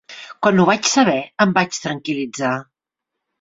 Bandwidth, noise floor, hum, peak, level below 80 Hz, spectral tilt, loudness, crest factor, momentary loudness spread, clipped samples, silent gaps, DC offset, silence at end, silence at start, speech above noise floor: 7.8 kHz; -82 dBFS; none; -2 dBFS; -60 dBFS; -4 dB/octave; -18 LUFS; 18 dB; 10 LU; under 0.1%; none; under 0.1%; 0.8 s; 0.1 s; 65 dB